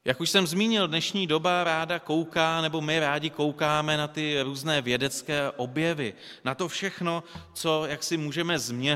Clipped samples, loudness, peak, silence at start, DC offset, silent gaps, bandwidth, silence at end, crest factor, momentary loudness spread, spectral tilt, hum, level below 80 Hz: under 0.1%; -27 LUFS; -6 dBFS; 0.05 s; under 0.1%; none; 16 kHz; 0 s; 22 dB; 7 LU; -4 dB/octave; none; -62 dBFS